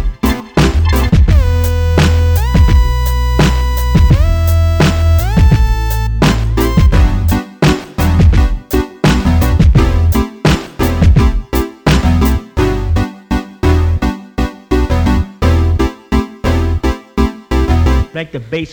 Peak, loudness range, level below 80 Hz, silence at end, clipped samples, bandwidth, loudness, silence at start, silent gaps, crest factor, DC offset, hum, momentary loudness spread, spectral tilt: 0 dBFS; 3 LU; -14 dBFS; 0 s; under 0.1%; over 20 kHz; -13 LUFS; 0 s; none; 10 dB; under 0.1%; none; 7 LU; -6.5 dB/octave